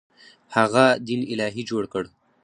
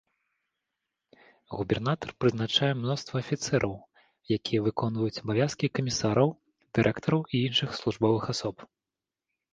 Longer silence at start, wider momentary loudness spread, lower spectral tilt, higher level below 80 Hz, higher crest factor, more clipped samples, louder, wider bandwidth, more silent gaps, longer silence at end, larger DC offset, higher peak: second, 0.5 s vs 1.5 s; first, 13 LU vs 7 LU; about the same, -5 dB/octave vs -5.5 dB/octave; about the same, -62 dBFS vs -58 dBFS; about the same, 22 dB vs 20 dB; neither; first, -22 LUFS vs -28 LUFS; about the same, 10.5 kHz vs 9.6 kHz; neither; second, 0.35 s vs 0.9 s; neither; first, -2 dBFS vs -10 dBFS